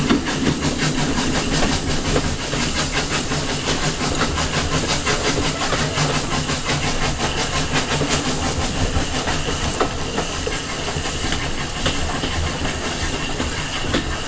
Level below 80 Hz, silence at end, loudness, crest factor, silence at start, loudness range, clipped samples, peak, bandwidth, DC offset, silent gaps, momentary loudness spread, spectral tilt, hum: -30 dBFS; 0 s; -21 LUFS; 18 dB; 0 s; 3 LU; under 0.1%; -4 dBFS; 8 kHz; 0.7%; none; 4 LU; -3.5 dB/octave; none